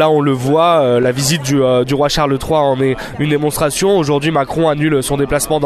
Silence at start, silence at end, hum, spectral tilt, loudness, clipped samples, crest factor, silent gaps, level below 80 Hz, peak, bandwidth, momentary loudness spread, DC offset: 0 s; 0 s; none; -5 dB/octave; -14 LUFS; under 0.1%; 12 dB; none; -36 dBFS; 0 dBFS; 13.5 kHz; 4 LU; under 0.1%